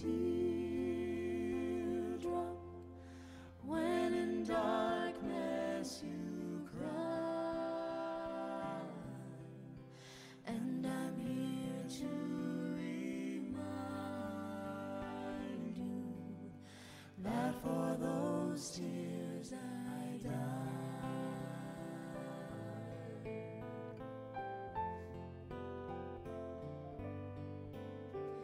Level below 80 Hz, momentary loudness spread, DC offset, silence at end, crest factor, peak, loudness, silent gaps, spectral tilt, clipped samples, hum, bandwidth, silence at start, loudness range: -66 dBFS; 12 LU; under 0.1%; 0 s; 18 dB; -24 dBFS; -42 LUFS; none; -6.5 dB/octave; under 0.1%; none; 16 kHz; 0 s; 8 LU